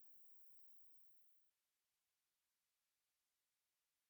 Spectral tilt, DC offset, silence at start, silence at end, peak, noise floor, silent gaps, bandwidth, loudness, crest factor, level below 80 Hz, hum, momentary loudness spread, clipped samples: -0.5 dB/octave; under 0.1%; 0 s; 2.6 s; -54 dBFS; under -90 dBFS; none; over 20 kHz; -63 LUFS; 18 dB; under -90 dBFS; none; 5 LU; under 0.1%